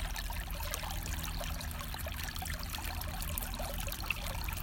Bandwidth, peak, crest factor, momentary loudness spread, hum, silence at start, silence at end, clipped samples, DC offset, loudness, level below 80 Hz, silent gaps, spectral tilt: 17 kHz; -16 dBFS; 22 dB; 3 LU; none; 0 s; 0 s; under 0.1%; under 0.1%; -39 LUFS; -42 dBFS; none; -3 dB/octave